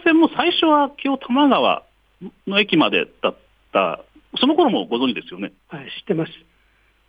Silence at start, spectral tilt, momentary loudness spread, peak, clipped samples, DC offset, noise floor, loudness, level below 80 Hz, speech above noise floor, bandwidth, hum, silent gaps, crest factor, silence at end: 0.05 s; -7 dB/octave; 17 LU; -2 dBFS; under 0.1%; under 0.1%; -59 dBFS; -19 LUFS; -62 dBFS; 40 dB; 5 kHz; none; none; 18 dB; 0.75 s